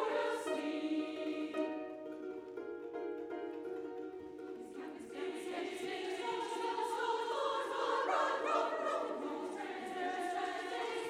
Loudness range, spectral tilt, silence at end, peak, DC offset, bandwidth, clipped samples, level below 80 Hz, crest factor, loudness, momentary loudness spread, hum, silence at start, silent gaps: 8 LU; -3 dB/octave; 0 s; -22 dBFS; under 0.1%; 15 kHz; under 0.1%; -82 dBFS; 16 dB; -39 LUFS; 11 LU; none; 0 s; none